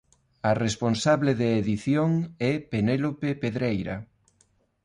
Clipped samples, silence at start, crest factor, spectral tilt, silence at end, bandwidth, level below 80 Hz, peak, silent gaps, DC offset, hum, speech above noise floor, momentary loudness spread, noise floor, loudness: under 0.1%; 0.45 s; 16 dB; -6.5 dB/octave; 0.8 s; 11.5 kHz; -54 dBFS; -10 dBFS; none; under 0.1%; none; 41 dB; 6 LU; -66 dBFS; -26 LUFS